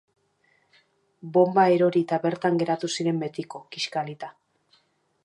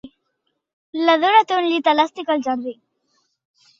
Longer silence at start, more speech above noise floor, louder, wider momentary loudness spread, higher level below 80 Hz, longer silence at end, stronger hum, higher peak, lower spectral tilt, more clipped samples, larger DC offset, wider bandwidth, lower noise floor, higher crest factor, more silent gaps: first, 1.25 s vs 0.05 s; second, 43 dB vs 56 dB; second, -24 LUFS vs -18 LUFS; first, 18 LU vs 12 LU; second, -76 dBFS vs -68 dBFS; about the same, 0.95 s vs 1.05 s; neither; second, -6 dBFS vs -2 dBFS; first, -5.5 dB/octave vs -3 dB/octave; neither; neither; first, 10.5 kHz vs 7.6 kHz; second, -67 dBFS vs -73 dBFS; about the same, 20 dB vs 18 dB; second, none vs 0.73-0.93 s